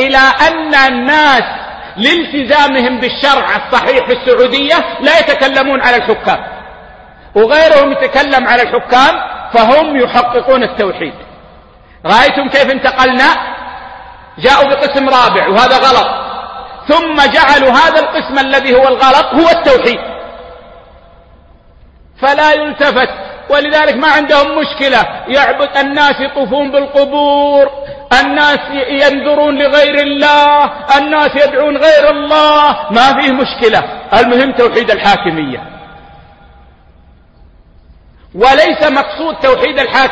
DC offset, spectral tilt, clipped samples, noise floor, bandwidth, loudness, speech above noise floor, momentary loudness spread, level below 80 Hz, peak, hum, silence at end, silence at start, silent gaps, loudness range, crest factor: under 0.1%; -4 dB/octave; 0.4%; -42 dBFS; 11 kHz; -9 LUFS; 33 dB; 9 LU; -38 dBFS; 0 dBFS; none; 0 s; 0 s; none; 5 LU; 10 dB